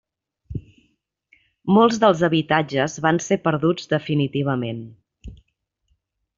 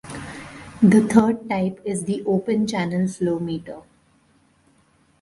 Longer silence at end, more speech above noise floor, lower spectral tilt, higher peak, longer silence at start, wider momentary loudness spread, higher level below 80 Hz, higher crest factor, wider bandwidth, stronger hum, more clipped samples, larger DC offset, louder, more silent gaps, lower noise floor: second, 1.05 s vs 1.4 s; first, 52 dB vs 40 dB; second, -5 dB/octave vs -6.5 dB/octave; about the same, -2 dBFS vs 0 dBFS; first, 0.5 s vs 0.05 s; second, 18 LU vs 21 LU; about the same, -52 dBFS vs -56 dBFS; about the same, 20 dB vs 22 dB; second, 7.6 kHz vs 11.5 kHz; neither; neither; neither; about the same, -20 LUFS vs -21 LUFS; neither; first, -71 dBFS vs -60 dBFS